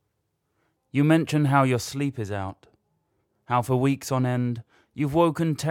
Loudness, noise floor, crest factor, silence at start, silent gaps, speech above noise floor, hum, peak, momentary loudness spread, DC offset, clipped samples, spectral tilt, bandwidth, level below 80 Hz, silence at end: -24 LUFS; -76 dBFS; 20 dB; 0.95 s; none; 52 dB; none; -6 dBFS; 11 LU; under 0.1%; under 0.1%; -6.5 dB/octave; 16.5 kHz; -60 dBFS; 0 s